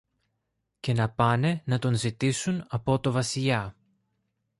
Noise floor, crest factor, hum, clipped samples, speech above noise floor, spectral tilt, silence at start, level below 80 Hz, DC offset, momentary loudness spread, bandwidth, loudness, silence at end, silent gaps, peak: -80 dBFS; 20 dB; none; under 0.1%; 54 dB; -5.5 dB/octave; 0.85 s; -56 dBFS; under 0.1%; 6 LU; 11.5 kHz; -27 LUFS; 0.9 s; none; -8 dBFS